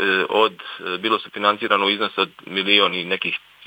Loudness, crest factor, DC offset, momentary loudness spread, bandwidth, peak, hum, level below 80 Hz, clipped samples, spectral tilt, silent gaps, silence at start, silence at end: -20 LUFS; 20 dB; under 0.1%; 9 LU; 17.5 kHz; 0 dBFS; none; -76 dBFS; under 0.1%; -4.5 dB/octave; none; 0 s; 0.3 s